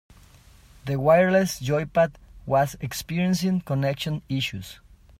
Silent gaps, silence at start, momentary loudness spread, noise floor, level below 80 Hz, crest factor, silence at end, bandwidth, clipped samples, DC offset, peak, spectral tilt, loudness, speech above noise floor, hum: none; 0.85 s; 13 LU; -52 dBFS; -50 dBFS; 18 dB; 0.45 s; 16 kHz; under 0.1%; under 0.1%; -6 dBFS; -6 dB/octave; -24 LUFS; 29 dB; none